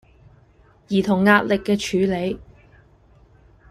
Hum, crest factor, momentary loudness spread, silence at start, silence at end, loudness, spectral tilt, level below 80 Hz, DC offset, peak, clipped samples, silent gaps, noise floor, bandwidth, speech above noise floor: none; 20 dB; 11 LU; 0.9 s; 1.25 s; -20 LUFS; -6 dB/octave; -50 dBFS; under 0.1%; -2 dBFS; under 0.1%; none; -54 dBFS; 13.5 kHz; 35 dB